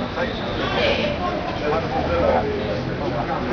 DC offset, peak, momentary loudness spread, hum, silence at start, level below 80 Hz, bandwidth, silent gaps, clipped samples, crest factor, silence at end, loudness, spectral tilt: under 0.1%; -8 dBFS; 5 LU; none; 0 s; -36 dBFS; 5.4 kHz; none; under 0.1%; 14 dB; 0 s; -22 LUFS; -6.5 dB/octave